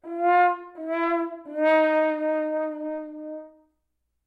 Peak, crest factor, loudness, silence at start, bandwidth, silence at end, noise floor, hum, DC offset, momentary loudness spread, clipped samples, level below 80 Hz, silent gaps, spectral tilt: -10 dBFS; 16 dB; -24 LUFS; 0.05 s; 5.2 kHz; 0.75 s; -76 dBFS; none; under 0.1%; 16 LU; under 0.1%; -78 dBFS; none; -4.5 dB/octave